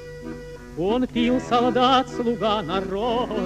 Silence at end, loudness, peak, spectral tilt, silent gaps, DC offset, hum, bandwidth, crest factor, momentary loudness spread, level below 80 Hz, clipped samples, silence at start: 0 s; -22 LUFS; -6 dBFS; -5.5 dB/octave; none; under 0.1%; none; 10.5 kHz; 16 dB; 17 LU; -44 dBFS; under 0.1%; 0 s